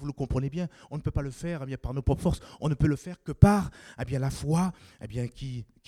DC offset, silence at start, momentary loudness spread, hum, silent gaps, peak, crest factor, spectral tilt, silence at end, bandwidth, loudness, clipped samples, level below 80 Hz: under 0.1%; 0 s; 17 LU; none; none; -2 dBFS; 26 dB; -7.5 dB/octave; 0.25 s; 14.5 kHz; -29 LUFS; under 0.1%; -40 dBFS